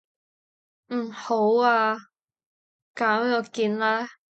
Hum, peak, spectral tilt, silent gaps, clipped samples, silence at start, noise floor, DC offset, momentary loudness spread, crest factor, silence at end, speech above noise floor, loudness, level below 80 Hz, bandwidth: none; -8 dBFS; -5 dB/octave; 2.46-2.94 s; under 0.1%; 0.9 s; under -90 dBFS; under 0.1%; 12 LU; 18 dB; 0.2 s; over 67 dB; -24 LUFS; -80 dBFS; 8.4 kHz